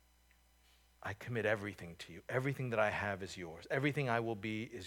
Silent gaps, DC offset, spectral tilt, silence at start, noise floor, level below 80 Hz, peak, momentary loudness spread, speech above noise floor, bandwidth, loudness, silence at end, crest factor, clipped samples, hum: none; under 0.1%; -6 dB/octave; 1 s; -69 dBFS; -70 dBFS; -18 dBFS; 13 LU; 31 dB; 18.5 kHz; -38 LUFS; 0 s; 20 dB; under 0.1%; none